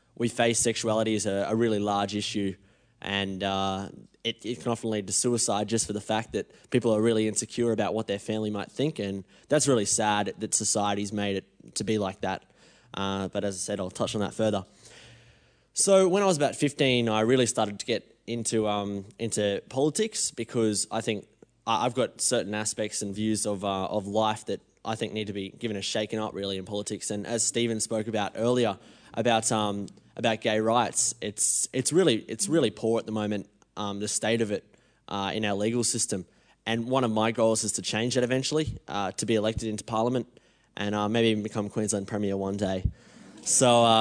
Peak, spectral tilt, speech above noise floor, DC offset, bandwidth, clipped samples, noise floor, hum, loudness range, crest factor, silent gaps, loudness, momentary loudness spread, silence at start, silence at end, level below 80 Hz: -8 dBFS; -3.5 dB/octave; 33 dB; under 0.1%; 10.5 kHz; under 0.1%; -60 dBFS; none; 5 LU; 20 dB; none; -27 LUFS; 10 LU; 0.2 s; 0 s; -54 dBFS